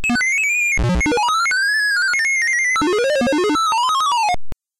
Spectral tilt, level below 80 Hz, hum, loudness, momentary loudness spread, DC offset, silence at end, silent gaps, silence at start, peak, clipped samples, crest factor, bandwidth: -3 dB/octave; -34 dBFS; none; -16 LUFS; 2 LU; under 0.1%; 0.25 s; none; 0 s; -12 dBFS; under 0.1%; 6 dB; 16.5 kHz